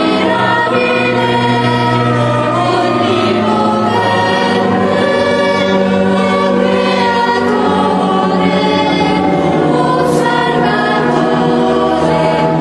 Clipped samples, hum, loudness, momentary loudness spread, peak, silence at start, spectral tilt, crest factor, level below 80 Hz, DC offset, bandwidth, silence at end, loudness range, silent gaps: under 0.1%; none; -12 LUFS; 1 LU; 0 dBFS; 0 s; -6 dB/octave; 10 dB; -44 dBFS; under 0.1%; 12 kHz; 0 s; 0 LU; none